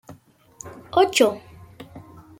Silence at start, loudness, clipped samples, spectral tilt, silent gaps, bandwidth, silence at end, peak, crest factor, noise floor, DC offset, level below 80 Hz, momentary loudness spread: 0.1 s; -20 LUFS; under 0.1%; -3 dB/octave; none; 16.5 kHz; 0.4 s; -4 dBFS; 22 dB; -49 dBFS; under 0.1%; -60 dBFS; 25 LU